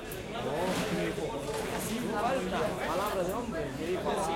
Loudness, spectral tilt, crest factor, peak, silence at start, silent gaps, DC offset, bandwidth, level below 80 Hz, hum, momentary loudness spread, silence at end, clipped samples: -33 LUFS; -4.5 dB/octave; 16 dB; -18 dBFS; 0 s; none; under 0.1%; 16.5 kHz; -50 dBFS; none; 4 LU; 0 s; under 0.1%